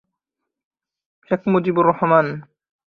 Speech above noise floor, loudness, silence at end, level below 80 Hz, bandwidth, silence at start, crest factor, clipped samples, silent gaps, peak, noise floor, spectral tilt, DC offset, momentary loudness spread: 65 dB; -18 LUFS; 0.45 s; -62 dBFS; 5.2 kHz; 1.3 s; 20 dB; under 0.1%; none; -2 dBFS; -83 dBFS; -10 dB/octave; under 0.1%; 10 LU